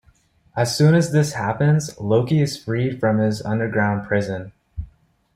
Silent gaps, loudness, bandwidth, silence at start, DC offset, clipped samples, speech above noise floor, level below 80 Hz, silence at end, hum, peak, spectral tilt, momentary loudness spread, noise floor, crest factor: none; -20 LUFS; 15 kHz; 0.55 s; under 0.1%; under 0.1%; 38 dB; -48 dBFS; 0.5 s; none; -6 dBFS; -6.5 dB/octave; 17 LU; -57 dBFS; 14 dB